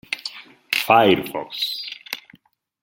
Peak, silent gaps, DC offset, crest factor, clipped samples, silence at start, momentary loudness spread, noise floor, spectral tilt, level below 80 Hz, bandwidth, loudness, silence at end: -2 dBFS; none; under 0.1%; 20 dB; under 0.1%; 0.1 s; 18 LU; -56 dBFS; -4 dB/octave; -64 dBFS; 17 kHz; -20 LUFS; 0.65 s